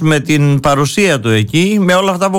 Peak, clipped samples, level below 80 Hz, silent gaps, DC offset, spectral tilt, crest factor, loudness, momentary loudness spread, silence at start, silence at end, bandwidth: -2 dBFS; under 0.1%; -42 dBFS; none; under 0.1%; -5.5 dB/octave; 8 dB; -11 LUFS; 1 LU; 0 s; 0 s; 17 kHz